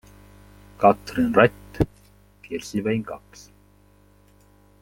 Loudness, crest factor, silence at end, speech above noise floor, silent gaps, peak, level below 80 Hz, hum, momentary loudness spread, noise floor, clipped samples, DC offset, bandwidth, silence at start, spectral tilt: -22 LUFS; 24 dB; 1.65 s; 34 dB; none; -2 dBFS; -46 dBFS; 50 Hz at -45 dBFS; 16 LU; -55 dBFS; under 0.1%; under 0.1%; 16.5 kHz; 0.8 s; -6.5 dB/octave